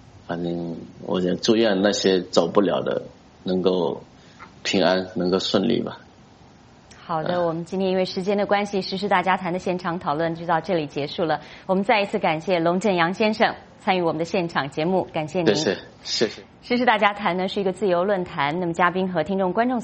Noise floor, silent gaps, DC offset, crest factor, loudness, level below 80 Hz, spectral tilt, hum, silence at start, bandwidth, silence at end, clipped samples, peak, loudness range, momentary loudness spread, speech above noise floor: -49 dBFS; none; under 0.1%; 22 dB; -23 LUFS; -58 dBFS; -5 dB/octave; none; 0.15 s; 8.4 kHz; 0 s; under 0.1%; -2 dBFS; 3 LU; 8 LU; 27 dB